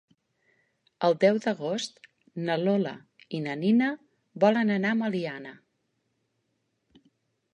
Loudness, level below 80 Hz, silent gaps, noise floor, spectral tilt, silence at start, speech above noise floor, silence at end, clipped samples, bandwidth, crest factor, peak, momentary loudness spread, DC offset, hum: -27 LUFS; -78 dBFS; none; -77 dBFS; -6 dB/octave; 1 s; 51 dB; 2 s; under 0.1%; 10.5 kHz; 20 dB; -8 dBFS; 16 LU; under 0.1%; none